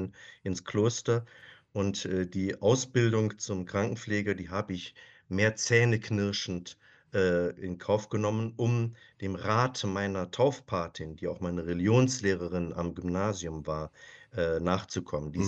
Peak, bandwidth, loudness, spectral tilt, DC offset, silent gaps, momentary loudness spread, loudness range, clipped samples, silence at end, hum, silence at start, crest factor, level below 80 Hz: -10 dBFS; 8.4 kHz; -30 LUFS; -5.5 dB/octave; under 0.1%; none; 11 LU; 2 LU; under 0.1%; 0 s; none; 0 s; 20 dB; -56 dBFS